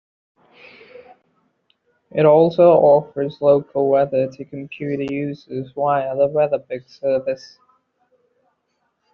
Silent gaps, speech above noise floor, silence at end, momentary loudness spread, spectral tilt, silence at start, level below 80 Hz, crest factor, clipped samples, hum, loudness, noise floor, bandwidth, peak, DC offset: none; 53 dB; 1.65 s; 17 LU; -6.5 dB/octave; 2.15 s; -64 dBFS; 16 dB; under 0.1%; none; -18 LUFS; -70 dBFS; 6.4 kHz; -2 dBFS; under 0.1%